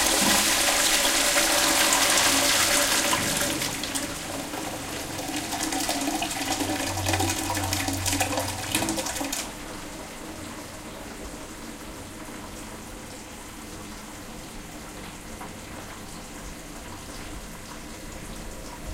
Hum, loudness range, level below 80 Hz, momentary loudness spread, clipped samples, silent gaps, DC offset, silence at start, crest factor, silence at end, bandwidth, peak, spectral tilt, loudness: none; 19 LU; -46 dBFS; 20 LU; under 0.1%; none; under 0.1%; 0 s; 22 dB; 0 s; 17 kHz; -6 dBFS; -1.5 dB/octave; -23 LUFS